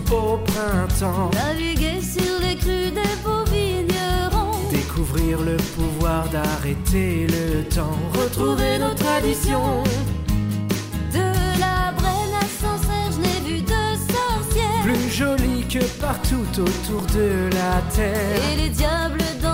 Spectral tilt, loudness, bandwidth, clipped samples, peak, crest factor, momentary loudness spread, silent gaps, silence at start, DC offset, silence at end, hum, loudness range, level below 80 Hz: -5 dB/octave; -22 LUFS; 16.5 kHz; under 0.1%; -8 dBFS; 12 dB; 3 LU; none; 0 s; 0.2%; 0 s; none; 1 LU; -28 dBFS